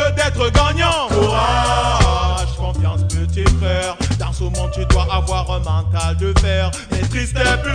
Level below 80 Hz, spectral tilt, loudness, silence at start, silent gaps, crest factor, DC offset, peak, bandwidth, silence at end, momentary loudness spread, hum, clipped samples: -20 dBFS; -5 dB/octave; -17 LUFS; 0 s; none; 14 dB; under 0.1%; -2 dBFS; 10 kHz; 0 s; 6 LU; none; under 0.1%